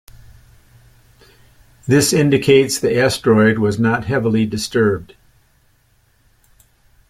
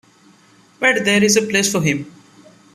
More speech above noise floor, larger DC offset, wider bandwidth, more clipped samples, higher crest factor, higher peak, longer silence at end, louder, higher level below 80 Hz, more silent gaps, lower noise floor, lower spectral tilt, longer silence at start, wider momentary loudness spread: first, 43 dB vs 35 dB; neither; first, 16 kHz vs 14.5 kHz; neither; about the same, 18 dB vs 18 dB; about the same, 0 dBFS vs -2 dBFS; first, 2.05 s vs 0.65 s; about the same, -15 LUFS vs -16 LUFS; first, -48 dBFS vs -58 dBFS; neither; first, -57 dBFS vs -51 dBFS; first, -5 dB/octave vs -3.5 dB/octave; first, 1.85 s vs 0.8 s; second, 6 LU vs 9 LU